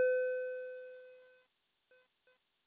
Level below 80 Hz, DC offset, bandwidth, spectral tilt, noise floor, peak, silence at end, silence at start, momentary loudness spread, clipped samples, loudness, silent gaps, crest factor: under -90 dBFS; under 0.1%; 4 kHz; 1 dB/octave; -79 dBFS; -24 dBFS; 1.45 s; 0 s; 22 LU; under 0.1%; -38 LUFS; none; 16 dB